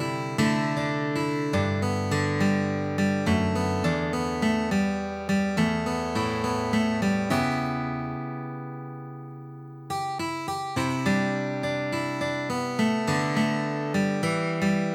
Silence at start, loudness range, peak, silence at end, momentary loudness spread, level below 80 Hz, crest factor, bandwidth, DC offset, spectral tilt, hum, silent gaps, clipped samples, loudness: 0 s; 5 LU; -12 dBFS; 0 s; 10 LU; -52 dBFS; 14 dB; 14.5 kHz; under 0.1%; -6 dB/octave; none; none; under 0.1%; -26 LUFS